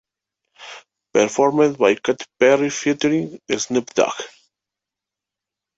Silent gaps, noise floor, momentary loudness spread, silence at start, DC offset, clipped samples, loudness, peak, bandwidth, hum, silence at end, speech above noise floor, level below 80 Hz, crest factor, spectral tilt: none; -86 dBFS; 17 LU; 0.6 s; under 0.1%; under 0.1%; -19 LUFS; -2 dBFS; 8 kHz; none; 1.5 s; 68 dB; -64 dBFS; 18 dB; -4 dB/octave